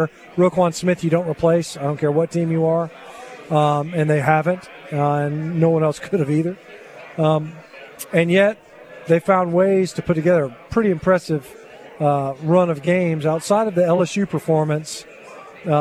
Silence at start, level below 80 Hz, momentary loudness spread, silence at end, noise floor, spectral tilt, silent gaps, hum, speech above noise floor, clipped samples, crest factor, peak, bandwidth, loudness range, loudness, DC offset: 0 s; -54 dBFS; 17 LU; 0 s; -40 dBFS; -7 dB/octave; none; none; 21 dB; under 0.1%; 18 dB; -2 dBFS; 14 kHz; 2 LU; -19 LUFS; under 0.1%